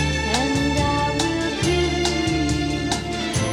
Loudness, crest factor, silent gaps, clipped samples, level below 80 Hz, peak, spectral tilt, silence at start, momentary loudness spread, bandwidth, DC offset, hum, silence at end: -21 LUFS; 14 dB; none; under 0.1%; -32 dBFS; -6 dBFS; -4.5 dB/octave; 0 s; 4 LU; 16 kHz; under 0.1%; none; 0 s